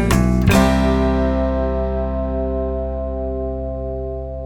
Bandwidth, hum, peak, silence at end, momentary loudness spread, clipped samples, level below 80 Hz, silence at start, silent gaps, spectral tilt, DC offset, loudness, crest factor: 18 kHz; none; -2 dBFS; 0 s; 11 LU; under 0.1%; -24 dBFS; 0 s; none; -6.5 dB/octave; 0.3%; -19 LUFS; 16 dB